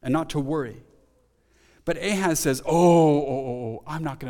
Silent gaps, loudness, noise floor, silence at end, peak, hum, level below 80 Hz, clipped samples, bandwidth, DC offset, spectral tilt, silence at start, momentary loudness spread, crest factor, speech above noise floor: none; -23 LUFS; -63 dBFS; 0 s; -6 dBFS; none; -50 dBFS; under 0.1%; 19 kHz; under 0.1%; -5.5 dB/octave; 0.05 s; 15 LU; 18 dB; 40 dB